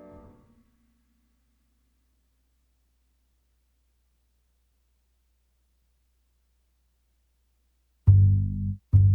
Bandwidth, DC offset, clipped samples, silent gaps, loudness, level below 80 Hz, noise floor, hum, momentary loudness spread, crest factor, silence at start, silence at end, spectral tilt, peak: 1.3 kHz; under 0.1%; under 0.1%; none; -23 LUFS; -42 dBFS; -70 dBFS; 60 Hz at -70 dBFS; 11 LU; 22 dB; 8.05 s; 0 s; -12.5 dB/octave; -8 dBFS